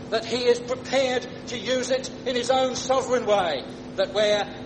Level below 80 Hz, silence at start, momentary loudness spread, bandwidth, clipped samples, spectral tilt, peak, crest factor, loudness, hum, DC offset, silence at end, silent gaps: -56 dBFS; 0 s; 7 LU; 9.4 kHz; under 0.1%; -3 dB/octave; -8 dBFS; 16 dB; -24 LUFS; none; under 0.1%; 0 s; none